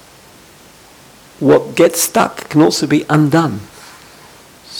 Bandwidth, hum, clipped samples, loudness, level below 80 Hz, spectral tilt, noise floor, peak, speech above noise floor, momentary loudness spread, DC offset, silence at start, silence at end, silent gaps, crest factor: 20 kHz; none; under 0.1%; -13 LUFS; -52 dBFS; -5 dB/octave; -42 dBFS; 0 dBFS; 30 dB; 8 LU; under 0.1%; 1.4 s; 0 s; none; 16 dB